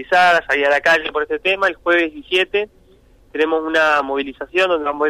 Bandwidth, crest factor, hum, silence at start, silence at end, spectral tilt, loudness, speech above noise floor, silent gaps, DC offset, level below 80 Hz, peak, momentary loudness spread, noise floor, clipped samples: 15 kHz; 12 dB; none; 0 s; 0 s; -3 dB/octave; -17 LUFS; 33 dB; none; under 0.1%; -50 dBFS; -6 dBFS; 9 LU; -50 dBFS; under 0.1%